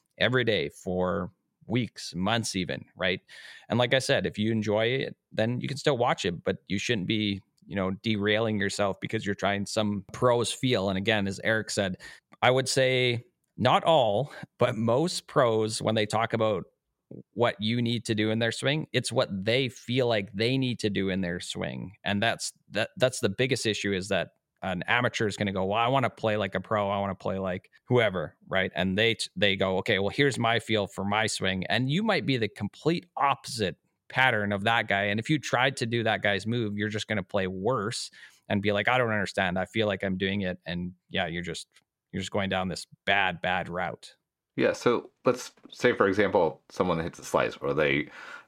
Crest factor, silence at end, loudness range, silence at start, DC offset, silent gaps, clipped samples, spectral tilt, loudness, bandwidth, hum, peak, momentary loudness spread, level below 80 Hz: 22 dB; 0.05 s; 3 LU; 0.2 s; under 0.1%; none; under 0.1%; -5 dB/octave; -27 LUFS; 16 kHz; none; -6 dBFS; 9 LU; -66 dBFS